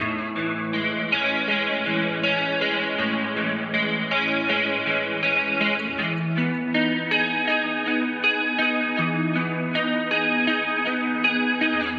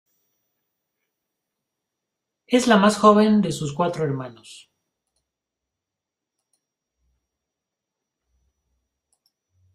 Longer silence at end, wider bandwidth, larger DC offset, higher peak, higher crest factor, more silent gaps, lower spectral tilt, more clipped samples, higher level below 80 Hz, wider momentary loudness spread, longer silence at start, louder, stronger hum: second, 0 s vs 5.2 s; second, 7 kHz vs 12.5 kHz; neither; second, -8 dBFS vs -2 dBFS; second, 16 dB vs 24 dB; neither; about the same, -6.5 dB/octave vs -5.5 dB/octave; neither; about the same, -64 dBFS vs -64 dBFS; second, 4 LU vs 12 LU; second, 0 s vs 2.5 s; second, -23 LUFS vs -19 LUFS; neither